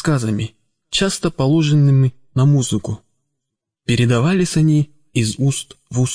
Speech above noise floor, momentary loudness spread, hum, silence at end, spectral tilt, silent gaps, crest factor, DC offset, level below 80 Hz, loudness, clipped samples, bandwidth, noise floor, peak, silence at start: 64 dB; 11 LU; none; 0 s; -6 dB/octave; none; 14 dB; under 0.1%; -44 dBFS; -17 LUFS; under 0.1%; 10.5 kHz; -80 dBFS; -4 dBFS; 0 s